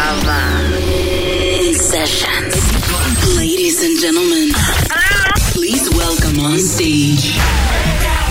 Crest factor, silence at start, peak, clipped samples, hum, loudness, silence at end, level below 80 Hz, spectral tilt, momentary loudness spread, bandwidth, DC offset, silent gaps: 12 dB; 0 s; -2 dBFS; under 0.1%; none; -13 LUFS; 0 s; -20 dBFS; -3.5 dB/octave; 3 LU; 16.5 kHz; under 0.1%; none